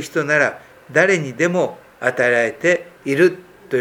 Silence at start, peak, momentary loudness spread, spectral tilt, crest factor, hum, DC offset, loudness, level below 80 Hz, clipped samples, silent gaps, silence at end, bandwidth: 0 s; 0 dBFS; 7 LU; -5 dB/octave; 18 dB; none; under 0.1%; -18 LUFS; -64 dBFS; under 0.1%; none; 0 s; 16.5 kHz